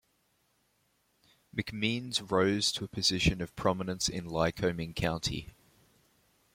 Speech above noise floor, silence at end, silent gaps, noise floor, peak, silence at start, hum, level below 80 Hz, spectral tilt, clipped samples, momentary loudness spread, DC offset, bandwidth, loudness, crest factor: 42 dB; 1.05 s; none; -73 dBFS; -12 dBFS; 1.55 s; none; -50 dBFS; -4 dB/octave; under 0.1%; 9 LU; under 0.1%; 16.5 kHz; -31 LUFS; 22 dB